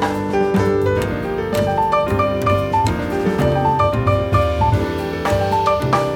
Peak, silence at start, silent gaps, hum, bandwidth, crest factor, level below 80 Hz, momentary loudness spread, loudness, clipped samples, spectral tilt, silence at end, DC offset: -2 dBFS; 0 s; none; none; 17.5 kHz; 14 dB; -32 dBFS; 4 LU; -18 LUFS; under 0.1%; -7 dB/octave; 0 s; under 0.1%